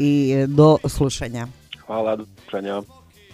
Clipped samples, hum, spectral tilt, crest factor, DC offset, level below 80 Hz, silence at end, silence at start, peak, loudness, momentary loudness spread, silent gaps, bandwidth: under 0.1%; none; -7 dB/octave; 20 dB; under 0.1%; -42 dBFS; 0.5 s; 0 s; 0 dBFS; -20 LUFS; 17 LU; none; 14.5 kHz